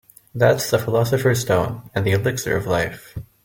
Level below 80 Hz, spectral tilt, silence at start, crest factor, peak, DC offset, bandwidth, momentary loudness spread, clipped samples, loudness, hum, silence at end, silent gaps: -48 dBFS; -5.5 dB/octave; 0.35 s; 18 dB; -2 dBFS; under 0.1%; 17 kHz; 9 LU; under 0.1%; -20 LUFS; none; 0.25 s; none